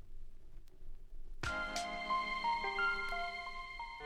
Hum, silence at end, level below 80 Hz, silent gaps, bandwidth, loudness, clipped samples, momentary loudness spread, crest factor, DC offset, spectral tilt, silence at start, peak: none; 0 s; -50 dBFS; none; 14 kHz; -38 LUFS; under 0.1%; 13 LU; 16 dB; under 0.1%; -2.5 dB/octave; 0 s; -24 dBFS